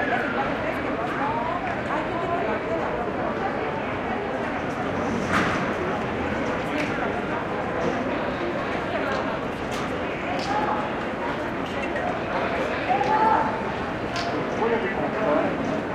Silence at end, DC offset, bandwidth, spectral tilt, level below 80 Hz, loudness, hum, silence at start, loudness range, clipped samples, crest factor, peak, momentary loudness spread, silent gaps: 0 s; under 0.1%; 15 kHz; -6 dB/octave; -48 dBFS; -26 LUFS; none; 0 s; 3 LU; under 0.1%; 18 dB; -8 dBFS; 5 LU; none